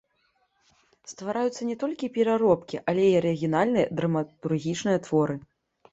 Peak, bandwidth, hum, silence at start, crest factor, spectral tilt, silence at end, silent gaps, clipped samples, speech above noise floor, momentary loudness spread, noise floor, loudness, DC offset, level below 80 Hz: -8 dBFS; 8.2 kHz; none; 1.1 s; 20 dB; -6.5 dB/octave; 0.55 s; none; under 0.1%; 45 dB; 8 LU; -70 dBFS; -26 LUFS; under 0.1%; -64 dBFS